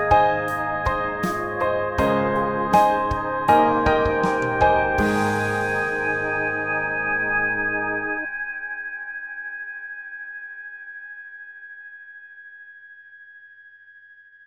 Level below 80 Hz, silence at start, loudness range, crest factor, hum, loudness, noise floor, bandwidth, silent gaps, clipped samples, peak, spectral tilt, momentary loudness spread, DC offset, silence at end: -42 dBFS; 0 s; 19 LU; 20 dB; none; -22 LUFS; -49 dBFS; over 20 kHz; none; under 0.1%; -2 dBFS; -6 dB/octave; 21 LU; under 0.1%; 0.35 s